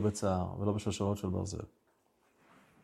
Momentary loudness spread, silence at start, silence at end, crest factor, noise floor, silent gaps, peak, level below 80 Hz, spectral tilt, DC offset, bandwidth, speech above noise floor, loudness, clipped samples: 9 LU; 0 s; 1.15 s; 18 dB; -72 dBFS; none; -16 dBFS; -62 dBFS; -6.5 dB/octave; under 0.1%; 13 kHz; 38 dB; -35 LUFS; under 0.1%